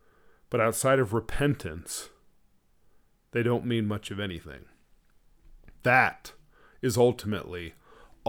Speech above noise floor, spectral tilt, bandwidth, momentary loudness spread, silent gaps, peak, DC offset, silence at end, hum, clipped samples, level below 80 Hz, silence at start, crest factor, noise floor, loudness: 36 dB; -5 dB/octave; over 20 kHz; 20 LU; none; -6 dBFS; under 0.1%; 0 s; none; under 0.1%; -50 dBFS; 0.5 s; 22 dB; -63 dBFS; -28 LUFS